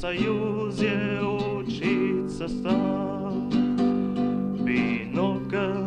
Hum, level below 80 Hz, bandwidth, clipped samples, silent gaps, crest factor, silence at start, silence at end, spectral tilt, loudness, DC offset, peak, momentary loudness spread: none; -50 dBFS; 9.4 kHz; under 0.1%; none; 16 dB; 0 s; 0 s; -7.5 dB/octave; -26 LUFS; under 0.1%; -10 dBFS; 5 LU